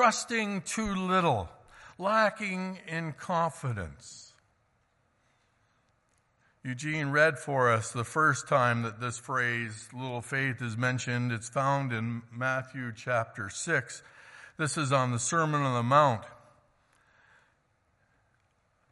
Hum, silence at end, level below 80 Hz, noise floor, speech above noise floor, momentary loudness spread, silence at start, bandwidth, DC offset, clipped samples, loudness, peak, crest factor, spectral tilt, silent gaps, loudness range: none; 2.55 s; -64 dBFS; -72 dBFS; 42 dB; 13 LU; 0 s; 11.5 kHz; under 0.1%; under 0.1%; -29 LUFS; -10 dBFS; 22 dB; -4.5 dB/octave; none; 9 LU